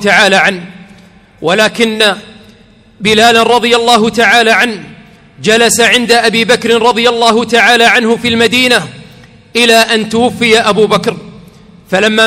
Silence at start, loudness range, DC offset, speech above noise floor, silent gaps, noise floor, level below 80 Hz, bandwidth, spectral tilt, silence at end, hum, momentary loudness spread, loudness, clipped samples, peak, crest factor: 0 s; 3 LU; under 0.1%; 33 dB; none; -41 dBFS; -46 dBFS; 19 kHz; -3 dB/octave; 0 s; none; 10 LU; -8 LUFS; 1%; 0 dBFS; 10 dB